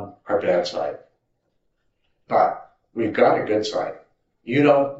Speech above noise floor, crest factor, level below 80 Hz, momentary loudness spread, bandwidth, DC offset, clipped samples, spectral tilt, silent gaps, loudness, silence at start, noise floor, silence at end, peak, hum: 51 dB; 20 dB; -68 dBFS; 17 LU; 8 kHz; under 0.1%; under 0.1%; -4.5 dB/octave; none; -21 LUFS; 0 s; -71 dBFS; 0 s; -4 dBFS; none